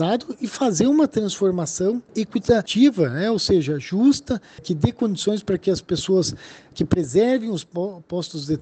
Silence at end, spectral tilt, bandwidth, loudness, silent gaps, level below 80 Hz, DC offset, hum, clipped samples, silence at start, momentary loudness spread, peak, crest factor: 0 s; -5.5 dB/octave; 9 kHz; -21 LUFS; none; -50 dBFS; under 0.1%; none; under 0.1%; 0 s; 11 LU; -4 dBFS; 18 dB